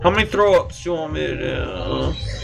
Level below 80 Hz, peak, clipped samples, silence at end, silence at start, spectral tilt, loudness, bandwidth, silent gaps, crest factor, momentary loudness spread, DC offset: -32 dBFS; -2 dBFS; under 0.1%; 0 s; 0 s; -5.5 dB/octave; -20 LUFS; 12 kHz; none; 18 dB; 9 LU; under 0.1%